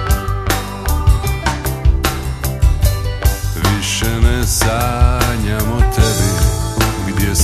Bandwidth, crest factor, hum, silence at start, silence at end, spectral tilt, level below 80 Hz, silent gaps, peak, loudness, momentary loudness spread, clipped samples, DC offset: 14 kHz; 14 dB; none; 0 s; 0 s; -4.5 dB/octave; -18 dBFS; none; 0 dBFS; -16 LUFS; 5 LU; under 0.1%; under 0.1%